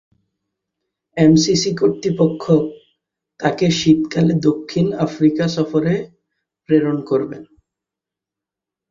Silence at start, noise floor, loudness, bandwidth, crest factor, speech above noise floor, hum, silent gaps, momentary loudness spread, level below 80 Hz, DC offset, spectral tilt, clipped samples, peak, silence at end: 1.15 s; -86 dBFS; -17 LUFS; 7.6 kHz; 16 dB; 70 dB; none; none; 9 LU; -54 dBFS; under 0.1%; -6 dB/octave; under 0.1%; -2 dBFS; 1.45 s